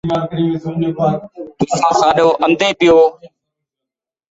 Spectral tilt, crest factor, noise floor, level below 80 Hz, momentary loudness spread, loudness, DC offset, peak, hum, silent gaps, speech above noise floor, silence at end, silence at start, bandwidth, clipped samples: -5.5 dB/octave; 16 dB; -85 dBFS; -50 dBFS; 10 LU; -14 LUFS; under 0.1%; 0 dBFS; none; none; 71 dB; 1.05 s; 0.05 s; 8 kHz; under 0.1%